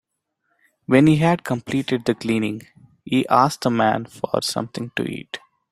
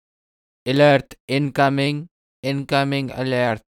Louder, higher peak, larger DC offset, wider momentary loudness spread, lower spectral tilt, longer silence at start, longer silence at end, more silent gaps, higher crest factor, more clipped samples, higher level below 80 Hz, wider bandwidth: about the same, -20 LUFS vs -20 LUFS; about the same, -2 dBFS vs -4 dBFS; neither; first, 14 LU vs 11 LU; about the same, -6 dB/octave vs -6.5 dB/octave; first, 0.9 s vs 0.65 s; first, 0.35 s vs 0.15 s; second, none vs 1.20-1.28 s, 2.11-2.43 s; about the same, 20 dB vs 18 dB; neither; about the same, -58 dBFS vs -56 dBFS; first, 15 kHz vs 13.5 kHz